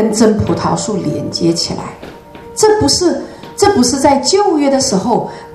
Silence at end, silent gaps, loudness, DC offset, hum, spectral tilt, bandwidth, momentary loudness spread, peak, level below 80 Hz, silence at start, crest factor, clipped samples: 0 s; none; -13 LUFS; under 0.1%; none; -4 dB/octave; 14 kHz; 14 LU; 0 dBFS; -40 dBFS; 0 s; 14 dB; 0.1%